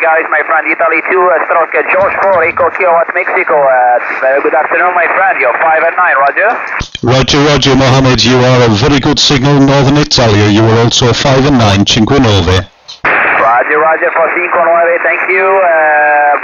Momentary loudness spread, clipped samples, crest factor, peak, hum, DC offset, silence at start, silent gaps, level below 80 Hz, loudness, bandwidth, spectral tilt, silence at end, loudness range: 3 LU; under 0.1%; 8 dB; 0 dBFS; none; under 0.1%; 0 s; none; -32 dBFS; -8 LUFS; 7.6 kHz; -5 dB/octave; 0 s; 2 LU